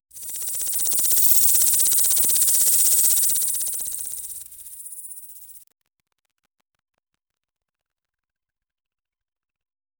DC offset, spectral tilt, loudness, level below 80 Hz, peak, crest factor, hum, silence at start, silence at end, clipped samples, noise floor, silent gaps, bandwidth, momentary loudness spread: under 0.1%; 2 dB/octave; -16 LUFS; -64 dBFS; 0 dBFS; 22 dB; none; 0.15 s; 4.4 s; under 0.1%; -87 dBFS; none; over 20 kHz; 21 LU